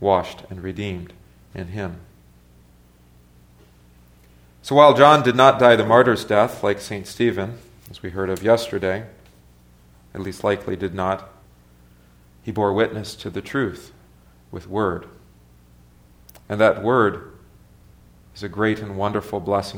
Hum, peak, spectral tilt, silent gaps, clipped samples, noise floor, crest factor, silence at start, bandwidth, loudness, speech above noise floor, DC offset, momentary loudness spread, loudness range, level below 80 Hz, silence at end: 60 Hz at -55 dBFS; 0 dBFS; -6 dB/octave; none; under 0.1%; -52 dBFS; 22 dB; 0 s; 17 kHz; -19 LUFS; 33 dB; under 0.1%; 23 LU; 15 LU; -52 dBFS; 0 s